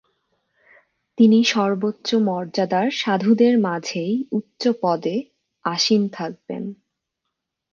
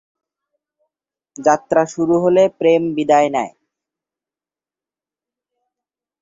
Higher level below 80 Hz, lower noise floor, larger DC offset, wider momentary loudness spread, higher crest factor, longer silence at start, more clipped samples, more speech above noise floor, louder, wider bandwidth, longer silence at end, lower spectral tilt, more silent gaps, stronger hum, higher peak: second, -72 dBFS vs -62 dBFS; second, -80 dBFS vs under -90 dBFS; neither; first, 14 LU vs 6 LU; about the same, 16 dB vs 18 dB; second, 1.2 s vs 1.4 s; neither; second, 60 dB vs over 75 dB; second, -20 LUFS vs -16 LUFS; about the same, 7.2 kHz vs 7.8 kHz; second, 1 s vs 2.75 s; about the same, -5 dB/octave vs -5.5 dB/octave; neither; neither; about the same, -4 dBFS vs -2 dBFS